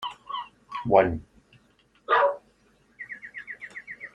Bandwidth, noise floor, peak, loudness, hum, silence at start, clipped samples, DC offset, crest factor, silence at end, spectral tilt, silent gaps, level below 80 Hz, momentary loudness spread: 9 kHz; -63 dBFS; -4 dBFS; -25 LUFS; none; 0 s; under 0.1%; under 0.1%; 24 dB; 0.05 s; -6.5 dB/octave; none; -56 dBFS; 19 LU